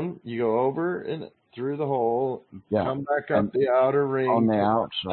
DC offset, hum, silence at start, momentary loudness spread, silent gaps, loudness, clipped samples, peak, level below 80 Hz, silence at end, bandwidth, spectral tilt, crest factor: under 0.1%; none; 0 s; 11 LU; none; -25 LUFS; under 0.1%; -10 dBFS; -62 dBFS; 0 s; 4.4 kHz; -11 dB/octave; 16 dB